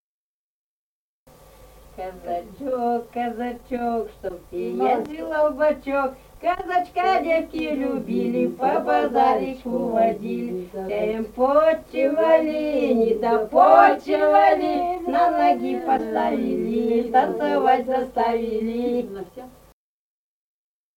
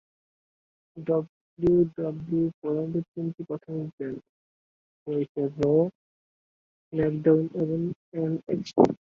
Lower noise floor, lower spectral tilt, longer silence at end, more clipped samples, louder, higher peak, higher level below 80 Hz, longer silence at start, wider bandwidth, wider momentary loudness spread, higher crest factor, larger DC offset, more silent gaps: about the same, under -90 dBFS vs under -90 dBFS; second, -6.5 dB/octave vs -9.5 dB/octave; first, 1.45 s vs 0.25 s; neither; first, -21 LUFS vs -27 LUFS; about the same, -2 dBFS vs -4 dBFS; first, -52 dBFS vs -58 dBFS; first, 1.95 s vs 0.95 s; first, 17 kHz vs 7.2 kHz; about the same, 12 LU vs 13 LU; about the same, 20 dB vs 24 dB; neither; second, none vs 1.29-1.57 s, 2.54-2.62 s, 3.08-3.14 s, 3.93-3.98 s, 4.29-5.06 s, 5.29-5.35 s, 5.95-6.91 s, 7.96-8.12 s